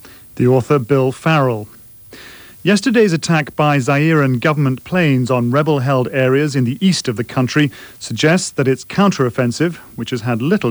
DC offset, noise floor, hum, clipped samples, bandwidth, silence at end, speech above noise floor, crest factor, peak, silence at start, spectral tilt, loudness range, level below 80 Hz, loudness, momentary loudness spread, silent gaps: under 0.1%; -39 dBFS; none; under 0.1%; over 20 kHz; 0 s; 24 dB; 14 dB; -2 dBFS; 0.05 s; -6 dB/octave; 2 LU; -52 dBFS; -15 LUFS; 10 LU; none